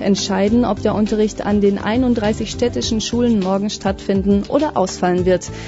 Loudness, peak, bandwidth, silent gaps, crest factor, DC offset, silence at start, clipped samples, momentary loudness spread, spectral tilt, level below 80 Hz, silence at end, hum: -17 LUFS; -2 dBFS; 8 kHz; none; 14 dB; under 0.1%; 0 s; under 0.1%; 4 LU; -5.5 dB/octave; -36 dBFS; 0 s; none